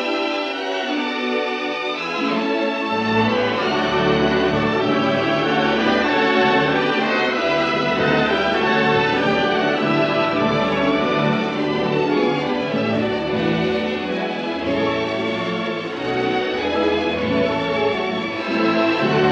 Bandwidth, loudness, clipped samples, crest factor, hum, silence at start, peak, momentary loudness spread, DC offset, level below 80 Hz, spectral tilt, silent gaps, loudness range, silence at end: 8.6 kHz; -19 LUFS; under 0.1%; 16 dB; none; 0 s; -4 dBFS; 6 LU; under 0.1%; -48 dBFS; -6 dB/octave; none; 4 LU; 0 s